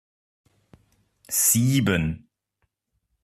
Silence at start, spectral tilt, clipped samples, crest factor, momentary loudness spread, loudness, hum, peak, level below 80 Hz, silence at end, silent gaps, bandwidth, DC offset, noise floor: 1.3 s; -4 dB/octave; under 0.1%; 20 dB; 12 LU; -21 LUFS; none; -6 dBFS; -52 dBFS; 1.05 s; none; 14.5 kHz; under 0.1%; -75 dBFS